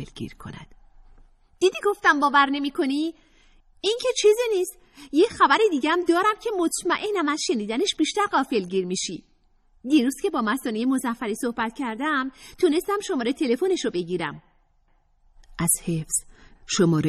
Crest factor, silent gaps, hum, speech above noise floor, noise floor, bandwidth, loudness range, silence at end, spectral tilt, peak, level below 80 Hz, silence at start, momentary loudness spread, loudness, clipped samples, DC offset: 20 dB; none; none; 39 dB; -62 dBFS; 14.5 kHz; 5 LU; 0 s; -4 dB/octave; -4 dBFS; -56 dBFS; 0 s; 10 LU; -23 LUFS; under 0.1%; under 0.1%